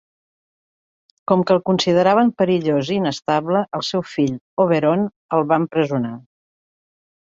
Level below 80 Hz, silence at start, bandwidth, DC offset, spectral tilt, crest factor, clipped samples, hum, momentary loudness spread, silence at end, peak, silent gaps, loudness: -62 dBFS; 1.3 s; 7.8 kHz; under 0.1%; -6.5 dB/octave; 18 dB; under 0.1%; none; 7 LU; 1.15 s; -2 dBFS; 4.41-4.57 s, 5.16-5.29 s; -19 LUFS